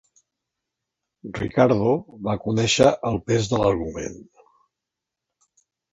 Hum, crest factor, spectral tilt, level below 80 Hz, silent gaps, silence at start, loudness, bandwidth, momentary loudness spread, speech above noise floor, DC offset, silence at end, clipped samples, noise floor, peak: none; 22 dB; -5 dB/octave; -48 dBFS; none; 1.25 s; -21 LUFS; 11 kHz; 15 LU; 64 dB; under 0.1%; 1.7 s; under 0.1%; -85 dBFS; -2 dBFS